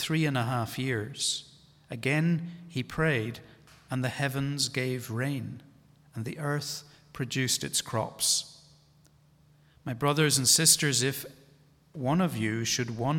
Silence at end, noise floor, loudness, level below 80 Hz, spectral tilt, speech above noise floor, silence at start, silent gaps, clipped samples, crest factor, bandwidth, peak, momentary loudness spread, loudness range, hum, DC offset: 0 s; -61 dBFS; -28 LUFS; -62 dBFS; -3.5 dB/octave; 32 dB; 0 s; none; under 0.1%; 22 dB; 18 kHz; -8 dBFS; 17 LU; 7 LU; none; under 0.1%